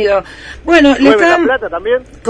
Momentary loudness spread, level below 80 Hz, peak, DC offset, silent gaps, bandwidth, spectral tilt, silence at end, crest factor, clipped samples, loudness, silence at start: 11 LU; -38 dBFS; 0 dBFS; under 0.1%; none; 10 kHz; -4.5 dB/octave; 0 s; 12 dB; 0.4%; -10 LUFS; 0 s